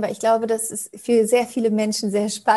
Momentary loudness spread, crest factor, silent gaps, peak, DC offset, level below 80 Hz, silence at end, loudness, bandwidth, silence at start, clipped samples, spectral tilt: 6 LU; 16 dB; none; -4 dBFS; under 0.1%; -68 dBFS; 0 s; -21 LUFS; 13 kHz; 0 s; under 0.1%; -4 dB/octave